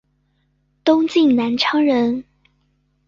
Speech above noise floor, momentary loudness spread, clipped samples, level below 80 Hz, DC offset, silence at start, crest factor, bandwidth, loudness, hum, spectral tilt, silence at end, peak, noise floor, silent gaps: 49 dB; 7 LU; under 0.1%; -60 dBFS; under 0.1%; 0.85 s; 16 dB; 7.4 kHz; -17 LUFS; 50 Hz at -50 dBFS; -5 dB/octave; 0.85 s; -2 dBFS; -65 dBFS; none